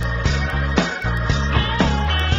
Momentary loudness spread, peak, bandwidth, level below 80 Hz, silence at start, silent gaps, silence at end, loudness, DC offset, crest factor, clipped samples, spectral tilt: 3 LU; -2 dBFS; 7.8 kHz; -24 dBFS; 0 s; none; 0 s; -20 LUFS; under 0.1%; 18 dB; under 0.1%; -5.5 dB/octave